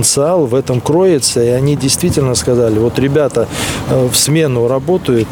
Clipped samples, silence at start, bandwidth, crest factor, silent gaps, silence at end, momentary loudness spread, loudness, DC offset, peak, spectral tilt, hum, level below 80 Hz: under 0.1%; 0 s; 20 kHz; 12 dB; none; 0 s; 4 LU; -12 LUFS; under 0.1%; 0 dBFS; -4.5 dB/octave; none; -36 dBFS